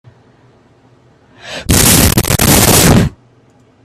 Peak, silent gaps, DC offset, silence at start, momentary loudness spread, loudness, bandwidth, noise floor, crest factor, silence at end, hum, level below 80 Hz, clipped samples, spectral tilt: 0 dBFS; none; under 0.1%; 1.45 s; 14 LU; -8 LUFS; over 20 kHz; -47 dBFS; 12 dB; 0.75 s; none; -26 dBFS; 0.3%; -3.5 dB/octave